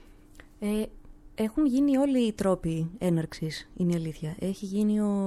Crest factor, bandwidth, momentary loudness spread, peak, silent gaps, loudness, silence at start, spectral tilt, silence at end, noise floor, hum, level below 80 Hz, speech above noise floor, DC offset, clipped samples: 14 dB; 13.5 kHz; 11 LU; -14 dBFS; none; -28 LUFS; 0.45 s; -7 dB/octave; 0 s; -51 dBFS; none; -50 dBFS; 24 dB; under 0.1%; under 0.1%